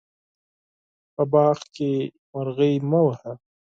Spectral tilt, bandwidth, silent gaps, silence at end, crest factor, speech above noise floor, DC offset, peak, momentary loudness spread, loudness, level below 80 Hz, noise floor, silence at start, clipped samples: -8.5 dB/octave; 7.6 kHz; 2.18-2.33 s; 0.3 s; 18 dB; over 68 dB; under 0.1%; -6 dBFS; 15 LU; -22 LUFS; -66 dBFS; under -90 dBFS; 1.2 s; under 0.1%